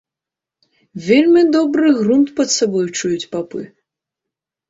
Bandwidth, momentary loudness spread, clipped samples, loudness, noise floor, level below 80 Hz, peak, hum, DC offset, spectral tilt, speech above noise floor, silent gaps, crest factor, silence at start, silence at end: 7.8 kHz; 17 LU; under 0.1%; -15 LUFS; -86 dBFS; -60 dBFS; -2 dBFS; none; under 0.1%; -4 dB/octave; 72 dB; none; 14 dB; 0.95 s; 1.05 s